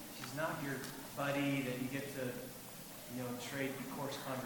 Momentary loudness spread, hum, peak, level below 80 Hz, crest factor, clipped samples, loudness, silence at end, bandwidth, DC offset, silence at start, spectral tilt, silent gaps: 10 LU; none; -24 dBFS; -70 dBFS; 18 dB; under 0.1%; -41 LUFS; 0 s; 19 kHz; under 0.1%; 0 s; -4.5 dB/octave; none